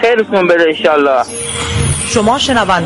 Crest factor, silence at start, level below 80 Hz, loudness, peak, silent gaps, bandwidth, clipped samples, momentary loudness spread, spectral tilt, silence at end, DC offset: 10 dB; 0 s; -32 dBFS; -12 LUFS; 0 dBFS; none; 11.5 kHz; under 0.1%; 6 LU; -4 dB/octave; 0 s; under 0.1%